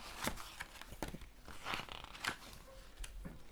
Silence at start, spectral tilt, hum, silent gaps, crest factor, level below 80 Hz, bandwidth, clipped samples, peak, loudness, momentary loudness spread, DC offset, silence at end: 0 s; -2.5 dB/octave; none; none; 28 dB; -54 dBFS; over 20 kHz; under 0.1%; -18 dBFS; -47 LUFS; 12 LU; under 0.1%; 0 s